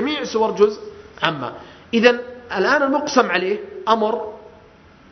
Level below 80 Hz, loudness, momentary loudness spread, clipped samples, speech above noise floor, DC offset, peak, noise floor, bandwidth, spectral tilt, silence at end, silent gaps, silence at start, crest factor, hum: -58 dBFS; -19 LUFS; 15 LU; under 0.1%; 29 dB; under 0.1%; 0 dBFS; -47 dBFS; 6.4 kHz; -4 dB/octave; 0.65 s; none; 0 s; 20 dB; none